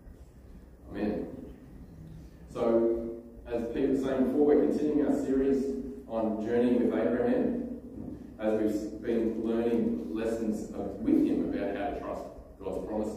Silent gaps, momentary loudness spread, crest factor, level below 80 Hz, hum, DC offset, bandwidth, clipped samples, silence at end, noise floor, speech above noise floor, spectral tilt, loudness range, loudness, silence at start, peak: none; 17 LU; 18 dB; -52 dBFS; none; under 0.1%; 13.5 kHz; under 0.1%; 0 s; -50 dBFS; 22 dB; -7.5 dB/octave; 5 LU; -30 LUFS; 0.05 s; -12 dBFS